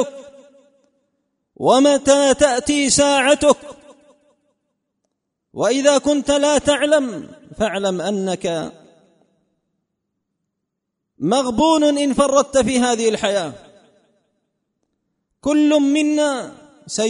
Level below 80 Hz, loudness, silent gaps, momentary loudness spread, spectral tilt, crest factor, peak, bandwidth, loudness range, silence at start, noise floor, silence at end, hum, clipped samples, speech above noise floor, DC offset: -50 dBFS; -17 LUFS; none; 12 LU; -3.5 dB/octave; 18 dB; 0 dBFS; 11 kHz; 10 LU; 0 s; -78 dBFS; 0 s; none; under 0.1%; 62 dB; under 0.1%